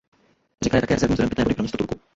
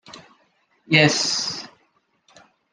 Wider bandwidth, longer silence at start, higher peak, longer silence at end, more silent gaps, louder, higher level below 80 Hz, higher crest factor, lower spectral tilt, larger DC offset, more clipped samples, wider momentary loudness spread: second, 8 kHz vs 10.5 kHz; first, 0.6 s vs 0.1 s; about the same, -4 dBFS vs -2 dBFS; second, 0.2 s vs 1.05 s; neither; second, -22 LUFS vs -18 LUFS; first, -40 dBFS vs -68 dBFS; second, 18 dB vs 24 dB; first, -6 dB/octave vs -3 dB/octave; neither; neither; second, 7 LU vs 18 LU